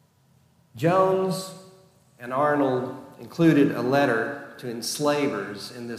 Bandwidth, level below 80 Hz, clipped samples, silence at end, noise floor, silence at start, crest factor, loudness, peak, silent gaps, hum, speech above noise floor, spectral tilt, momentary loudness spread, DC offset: 15.5 kHz; -72 dBFS; under 0.1%; 0 s; -61 dBFS; 0.75 s; 16 dB; -24 LUFS; -8 dBFS; none; none; 38 dB; -5.5 dB/octave; 15 LU; under 0.1%